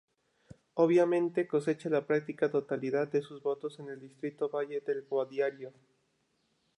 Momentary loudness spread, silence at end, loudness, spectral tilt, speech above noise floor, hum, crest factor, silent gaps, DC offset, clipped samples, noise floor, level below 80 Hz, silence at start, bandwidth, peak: 14 LU; 1.1 s; -32 LUFS; -7.5 dB/octave; 44 dB; none; 18 dB; none; under 0.1%; under 0.1%; -76 dBFS; -80 dBFS; 0.75 s; 11 kHz; -14 dBFS